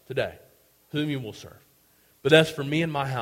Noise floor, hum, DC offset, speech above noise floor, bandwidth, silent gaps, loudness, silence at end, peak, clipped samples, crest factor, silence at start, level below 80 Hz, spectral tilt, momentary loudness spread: -61 dBFS; none; under 0.1%; 37 dB; 16.5 kHz; none; -25 LUFS; 0 s; -4 dBFS; under 0.1%; 24 dB; 0.1 s; -60 dBFS; -5.5 dB/octave; 15 LU